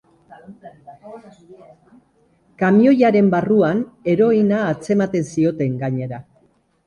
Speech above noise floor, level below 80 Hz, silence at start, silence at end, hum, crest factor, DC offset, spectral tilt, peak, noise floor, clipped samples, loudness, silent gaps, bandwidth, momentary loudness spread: 41 dB; -58 dBFS; 0.5 s; 0.65 s; none; 16 dB; under 0.1%; -8 dB/octave; -2 dBFS; -59 dBFS; under 0.1%; -17 LUFS; none; 10.5 kHz; 13 LU